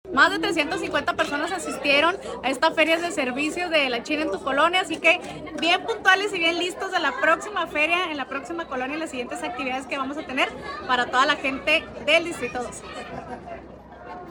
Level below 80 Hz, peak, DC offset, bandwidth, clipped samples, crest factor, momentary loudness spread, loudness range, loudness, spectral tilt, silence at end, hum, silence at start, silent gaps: -54 dBFS; -4 dBFS; under 0.1%; 18 kHz; under 0.1%; 22 dB; 14 LU; 4 LU; -23 LUFS; -2.5 dB/octave; 0 s; none; 0.05 s; none